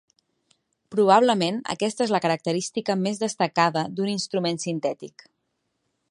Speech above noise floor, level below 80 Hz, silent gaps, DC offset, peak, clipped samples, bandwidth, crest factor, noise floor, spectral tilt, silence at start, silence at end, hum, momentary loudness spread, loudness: 53 dB; -74 dBFS; none; under 0.1%; -4 dBFS; under 0.1%; 11.5 kHz; 22 dB; -76 dBFS; -4.5 dB/octave; 0.9 s; 1 s; none; 10 LU; -24 LUFS